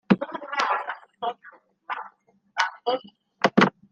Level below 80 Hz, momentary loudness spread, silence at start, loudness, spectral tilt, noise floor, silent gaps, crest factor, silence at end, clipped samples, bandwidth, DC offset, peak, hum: -70 dBFS; 15 LU; 0.1 s; -26 LUFS; -5.5 dB/octave; -57 dBFS; none; 24 dB; 0.2 s; under 0.1%; 9.2 kHz; under 0.1%; -2 dBFS; none